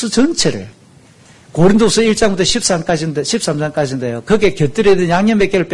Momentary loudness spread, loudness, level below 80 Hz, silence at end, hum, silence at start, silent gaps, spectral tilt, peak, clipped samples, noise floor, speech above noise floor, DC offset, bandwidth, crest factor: 7 LU; -14 LUFS; -38 dBFS; 0 s; none; 0 s; none; -4.5 dB/octave; 0 dBFS; under 0.1%; -44 dBFS; 31 dB; under 0.1%; 12 kHz; 12 dB